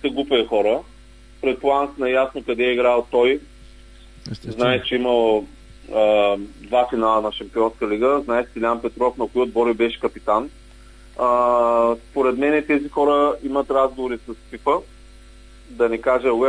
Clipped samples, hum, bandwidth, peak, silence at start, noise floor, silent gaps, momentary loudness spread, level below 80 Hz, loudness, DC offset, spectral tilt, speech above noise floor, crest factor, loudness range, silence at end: under 0.1%; none; 10.5 kHz; -4 dBFS; 0 s; -44 dBFS; none; 9 LU; -46 dBFS; -20 LUFS; under 0.1%; -6 dB/octave; 25 dB; 16 dB; 2 LU; 0 s